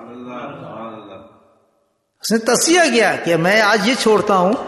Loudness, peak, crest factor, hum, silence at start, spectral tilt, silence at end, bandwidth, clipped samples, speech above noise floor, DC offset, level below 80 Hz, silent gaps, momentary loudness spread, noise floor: -14 LUFS; -2 dBFS; 14 dB; none; 0 s; -3 dB/octave; 0 s; 12.5 kHz; under 0.1%; 50 dB; under 0.1%; -60 dBFS; none; 20 LU; -65 dBFS